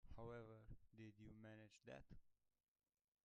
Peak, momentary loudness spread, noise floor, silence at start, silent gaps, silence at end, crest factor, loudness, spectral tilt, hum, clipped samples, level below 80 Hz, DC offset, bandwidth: -44 dBFS; 7 LU; under -90 dBFS; 0.05 s; none; 0.9 s; 18 dB; -62 LUFS; -7 dB/octave; none; under 0.1%; -72 dBFS; under 0.1%; 8.2 kHz